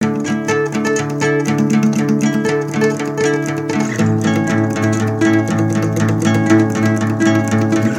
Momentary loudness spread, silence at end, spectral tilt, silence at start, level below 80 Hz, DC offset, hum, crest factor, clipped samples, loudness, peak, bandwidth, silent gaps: 4 LU; 0 s; -6 dB/octave; 0 s; -54 dBFS; under 0.1%; none; 14 dB; under 0.1%; -15 LUFS; 0 dBFS; 16 kHz; none